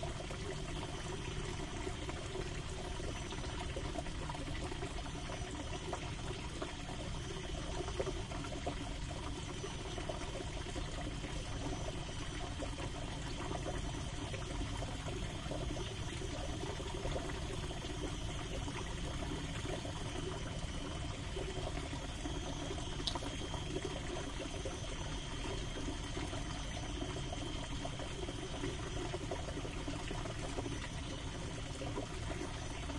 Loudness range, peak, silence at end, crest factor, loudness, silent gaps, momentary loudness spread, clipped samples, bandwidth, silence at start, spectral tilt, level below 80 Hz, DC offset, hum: 1 LU; -18 dBFS; 0 s; 22 dB; -42 LUFS; none; 2 LU; under 0.1%; 11.5 kHz; 0 s; -4.5 dB/octave; -46 dBFS; under 0.1%; none